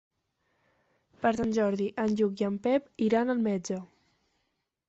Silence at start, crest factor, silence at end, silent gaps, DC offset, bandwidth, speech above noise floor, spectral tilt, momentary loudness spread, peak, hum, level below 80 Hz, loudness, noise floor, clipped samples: 1.2 s; 18 dB; 1.05 s; none; under 0.1%; 8 kHz; 52 dB; -6.5 dB/octave; 4 LU; -14 dBFS; none; -64 dBFS; -29 LUFS; -80 dBFS; under 0.1%